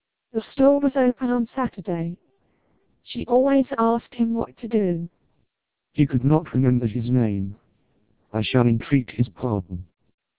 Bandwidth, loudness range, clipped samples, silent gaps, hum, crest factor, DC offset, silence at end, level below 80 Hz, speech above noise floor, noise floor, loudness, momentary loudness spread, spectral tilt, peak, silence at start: 4 kHz; 2 LU; under 0.1%; none; none; 18 dB; 0.2%; 0.55 s; -50 dBFS; 57 dB; -78 dBFS; -23 LUFS; 13 LU; -12 dB/octave; -4 dBFS; 0.35 s